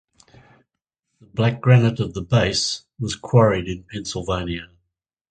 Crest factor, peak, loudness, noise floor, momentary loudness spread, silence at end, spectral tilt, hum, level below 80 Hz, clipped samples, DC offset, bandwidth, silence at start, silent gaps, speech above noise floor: 22 dB; 0 dBFS; -20 LUFS; -80 dBFS; 14 LU; 0.65 s; -5.5 dB/octave; none; -44 dBFS; under 0.1%; under 0.1%; 9.4 kHz; 1.35 s; none; 60 dB